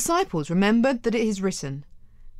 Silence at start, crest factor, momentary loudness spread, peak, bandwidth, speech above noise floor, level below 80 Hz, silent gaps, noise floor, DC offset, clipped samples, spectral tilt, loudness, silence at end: 0 s; 16 dB; 13 LU; -8 dBFS; 15 kHz; 20 dB; -48 dBFS; none; -43 dBFS; under 0.1%; under 0.1%; -5 dB/octave; -23 LUFS; 0 s